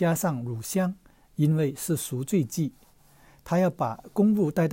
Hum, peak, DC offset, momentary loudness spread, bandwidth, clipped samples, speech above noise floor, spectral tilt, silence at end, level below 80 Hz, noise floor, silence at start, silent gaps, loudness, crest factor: none; -12 dBFS; under 0.1%; 8 LU; 16.5 kHz; under 0.1%; 31 dB; -6.5 dB/octave; 0 s; -60 dBFS; -56 dBFS; 0 s; none; -27 LUFS; 14 dB